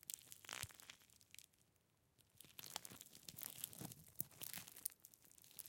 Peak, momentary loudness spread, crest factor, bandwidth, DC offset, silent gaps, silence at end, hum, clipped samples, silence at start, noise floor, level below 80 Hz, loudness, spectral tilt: -18 dBFS; 15 LU; 38 dB; 17 kHz; under 0.1%; none; 0 s; none; under 0.1%; 0 s; -80 dBFS; -84 dBFS; -52 LUFS; -1.5 dB/octave